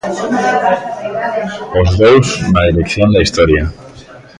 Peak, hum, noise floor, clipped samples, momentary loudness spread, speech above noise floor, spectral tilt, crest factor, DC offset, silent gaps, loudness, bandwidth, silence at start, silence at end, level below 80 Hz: 0 dBFS; none; -36 dBFS; under 0.1%; 10 LU; 24 dB; -6 dB/octave; 12 dB; under 0.1%; none; -12 LUFS; 11 kHz; 0.05 s; 0.2 s; -26 dBFS